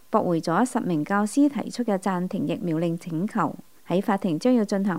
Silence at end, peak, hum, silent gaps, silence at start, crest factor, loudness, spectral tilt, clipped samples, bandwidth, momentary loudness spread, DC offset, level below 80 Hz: 0 s; -6 dBFS; none; none; 0.1 s; 18 dB; -25 LUFS; -6.5 dB/octave; under 0.1%; 16 kHz; 6 LU; 0.3%; -70 dBFS